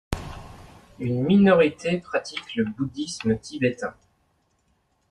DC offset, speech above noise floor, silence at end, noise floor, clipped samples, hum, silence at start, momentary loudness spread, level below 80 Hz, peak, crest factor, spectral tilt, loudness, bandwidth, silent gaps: under 0.1%; 45 dB; 1.2 s; -68 dBFS; under 0.1%; none; 0.1 s; 17 LU; -48 dBFS; -6 dBFS; 18 dB; -6.5 dB/octave; -24 LUFS; 12 kHz; none